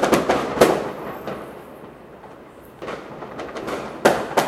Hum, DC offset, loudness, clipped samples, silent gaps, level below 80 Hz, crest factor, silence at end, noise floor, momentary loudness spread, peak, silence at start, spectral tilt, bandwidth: none; under 0.1%; -22 LUFS; under 0.1%; none; -50 dBFS; 24 dB; 0 s; -42 dBFS; 24 LU; 0 dBFS; 0 s; -4.5 dB/octave; 16 kHz